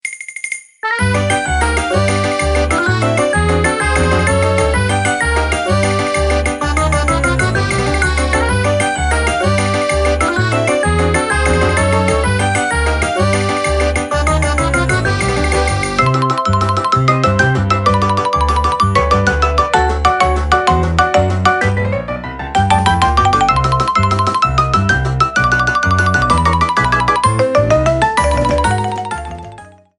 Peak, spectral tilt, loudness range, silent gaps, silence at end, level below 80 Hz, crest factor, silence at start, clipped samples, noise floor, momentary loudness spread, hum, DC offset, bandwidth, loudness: 0 dBFS; -5 dB/octave; 2 LU; none; 0.3 s; -22 dBFS; 14 dB; 0.05 s; under 0.1%; -37 dBFS; 3 LU; none; under 0.1%; 11.5 kHz; -14 LUFS